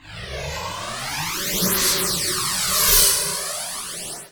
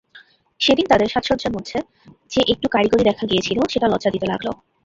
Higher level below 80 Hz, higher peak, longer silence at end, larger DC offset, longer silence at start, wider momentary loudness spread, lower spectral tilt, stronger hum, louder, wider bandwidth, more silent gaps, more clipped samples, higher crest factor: first, -40 dBFS vs -46 dBFS; about the same, -2 dBFS vs -2 dBFS; second, 0.05 s vs 0.3 s; neither; about the same, 0.05 s vs 0.15 s; first, 15 LU vs 10 LU; second, -1 dB/octave vs -5 dB/octave; neither; about the same, -19 LUFS vs -19 LUFS; first, over 20 kHz vs 7.8 kHz; neither; neither; about the same, 20 dB vs 18 dB